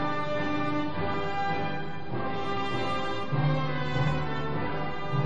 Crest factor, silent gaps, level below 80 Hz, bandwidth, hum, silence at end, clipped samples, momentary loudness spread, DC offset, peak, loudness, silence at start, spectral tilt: 14 dB; none; -50 dBFS; 8.8 kHz; none; 0 s; under 0.1%; 5 LU; 3%; -14 dBFS; -30 LUFS; 0 s; -7 dB/octave